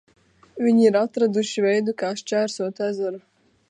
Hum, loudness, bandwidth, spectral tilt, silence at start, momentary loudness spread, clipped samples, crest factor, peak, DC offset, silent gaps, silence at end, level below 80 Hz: none; -22 LUFS; 10 kHz; -5 dB/octave; 0.55 s; 11 LU; under 0.1%; 18 dB; -6 dBFS; under 0.1%; none; 0.5 s; -74 dBFS